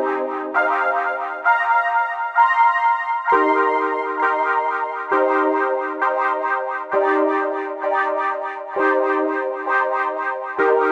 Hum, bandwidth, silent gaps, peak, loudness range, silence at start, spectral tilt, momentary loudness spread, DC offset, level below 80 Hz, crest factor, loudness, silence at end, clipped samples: none; 7.6 kHz; none; -2 dBFS; 3 LU; 0 s; -4.5 dB/octave; 7 LU; under 0.1%; -78 dBFS; 16 dB; -19 LUFS; 0 s; under 0.1%